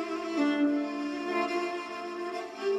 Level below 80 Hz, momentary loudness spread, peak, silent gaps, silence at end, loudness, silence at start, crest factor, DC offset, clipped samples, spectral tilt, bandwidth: -76 dBFS; 9 LU; -18 dBFS; none; 0 s; -31 LUFS; 0 s; 14 dB; under 0.1%; under 0.1%; -4 dB/octave; 11.5 kHz